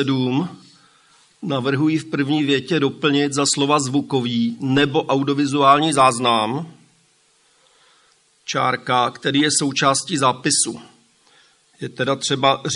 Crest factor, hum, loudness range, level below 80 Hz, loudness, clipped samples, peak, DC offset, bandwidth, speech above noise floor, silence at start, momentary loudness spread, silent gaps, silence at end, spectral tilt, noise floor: 18 dB; none; 4 LU; -66 dBFS; -18 LUFS; under 0.1%; -2 dBFS; under 0.1%; 11.5 kHz; 40 dB; 0 s; 10 LU; none; 0 s; -4 dB/octave; -59 dBFS